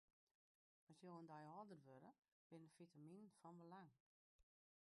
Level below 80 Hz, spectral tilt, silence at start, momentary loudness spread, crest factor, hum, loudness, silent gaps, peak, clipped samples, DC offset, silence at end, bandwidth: under -90 dBFS; -7 dB/octave; 0.9 s; 7 LU; 18 dB; none; -64 LUFS; 2.28-2.50 s, 4.00-4.39 s; -48 dBFS; under 0.1%; under 0.1%; 0.45 s; 11.5 kHz